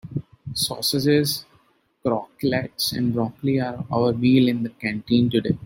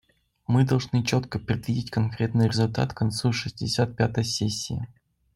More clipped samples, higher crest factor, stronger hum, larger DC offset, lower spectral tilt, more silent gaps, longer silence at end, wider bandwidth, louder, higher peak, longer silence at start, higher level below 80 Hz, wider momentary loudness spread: neither; about the same, 16 dB vs 16 dB; neither; neither; about the same, -5.5 dB/octave vs -5.5 dB/octave; neither; second, 0 s vs 0.5 s; first, 16.5 kHz vs 12.5 kHz; first, -22 LUFS vs -26 LUFS; first, -6 dBFS vs -10 dBFS; second, 0.05 s vs 0.5 s; about the same, -54 dBFS vs -52 dBFS; first, 10 LU vs 7 LU